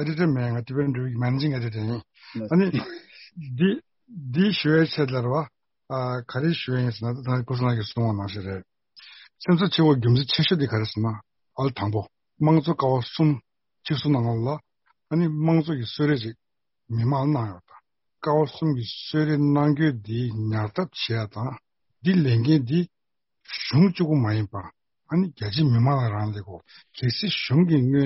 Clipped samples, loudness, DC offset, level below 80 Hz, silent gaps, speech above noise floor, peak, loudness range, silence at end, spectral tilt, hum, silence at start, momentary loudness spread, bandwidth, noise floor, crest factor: under 0.1%; -24 LUFS; under 0.1%; -58 dBFS; none; 58 dB; -6 dBFS; 3 LU; 0 s; -6 dB/octave; none; 0 s; 14 LU; 6 kHz; -81 dBFS; 18 dB